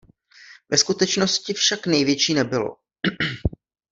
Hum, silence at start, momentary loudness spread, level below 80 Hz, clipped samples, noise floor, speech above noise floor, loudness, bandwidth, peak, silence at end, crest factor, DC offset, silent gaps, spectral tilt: none; 0.5 s; 9 LU; -44 dBFS; under 0.1%; -49 dBFS; 28 dB; -21 LUFS; 7.8 kHz; -2 dBFS; 0.45 s; 20 dB; under 0.1%; none; -3 dB/octave